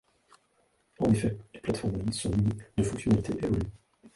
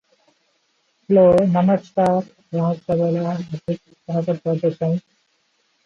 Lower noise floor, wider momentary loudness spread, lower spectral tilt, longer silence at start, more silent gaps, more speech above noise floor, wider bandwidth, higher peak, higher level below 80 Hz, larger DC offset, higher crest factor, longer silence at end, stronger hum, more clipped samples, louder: first, -70 dBFS vs -66 dBFS; second, 7 LU vs 13 LU; second, -6.5 dB/octave vs -9.5 dB/octave; about the same, 1 s vs 1.1 s; neither; second, 42 dB vs 47 dB; first, 11.5 kHz vs 7.2 kHz; second, -12 dBFS vs -4 dBFS; first, -46 dBFS vs -56 dBFS; neither; about the same, 18 dB vs 16 dB; second, 0.05 s vs 0.85 s; neither; neither; second, -30 LUFS vs -20 LUFS